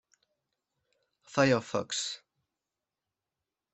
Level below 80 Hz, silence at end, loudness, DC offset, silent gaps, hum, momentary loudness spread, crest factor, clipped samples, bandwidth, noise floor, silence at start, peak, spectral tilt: -72 dBFS; 1.6 s; -30 LUFS; under 0.1%; none; none; 11 LU; 26 dB; under 0.1%; 8.4 kHz; -89 dBFS; 1.3 s; -10 dBFS; -4 dB/octave